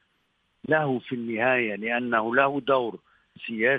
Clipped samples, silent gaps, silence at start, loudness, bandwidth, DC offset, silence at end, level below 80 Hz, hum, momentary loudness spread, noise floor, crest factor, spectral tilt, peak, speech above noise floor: under 0.1%; none; 0.7 s; -25 LUFS; 4.9 kHz; under 0.1%; 0 s; -72 dBFS; none; 12 LU; -71 dBFS; 18 dB; -8.5 dB/octave; -8 dBFS; 46 dB